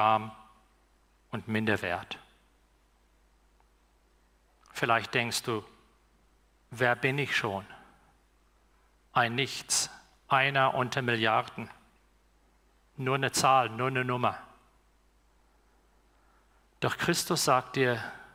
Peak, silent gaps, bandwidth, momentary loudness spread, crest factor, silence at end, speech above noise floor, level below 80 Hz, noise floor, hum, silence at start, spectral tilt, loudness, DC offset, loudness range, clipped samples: -10 dBFS; none; 18 kHz; 16 LU; 22 dB; 0.1 s; 37 dB; -66 dBFS; -66 dBFS; 60 Hz at -65 dBFS; 0 s; -3.5 dB/octave; -29 LUFS; under 0.1%; 8 LU; under 0.1%